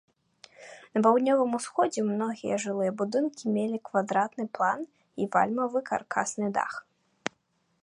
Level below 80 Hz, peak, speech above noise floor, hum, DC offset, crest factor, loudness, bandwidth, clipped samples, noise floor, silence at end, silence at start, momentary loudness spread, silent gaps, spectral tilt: -76 dBFS; -8 dBFS; 45 dB; none; under 0.1%; 22 dB; -28 LUFS; 11 kHz; under 0.1%; -72 dBFS; 0.55 s; 0.6 s; 14 LU; none; -5 dB/octave